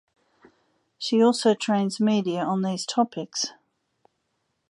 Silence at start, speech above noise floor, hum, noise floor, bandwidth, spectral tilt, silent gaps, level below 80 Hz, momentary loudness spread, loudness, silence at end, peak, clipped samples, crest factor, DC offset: 1 s; 52 dB; none; -75 dBFS; 11.5 kHz; -5 dB/octave; none; -76 dBFS; 9 LU; -24 LUFS; 1.2 s; -8 dBFS; under 0.1%; 18 dB; under 0.1%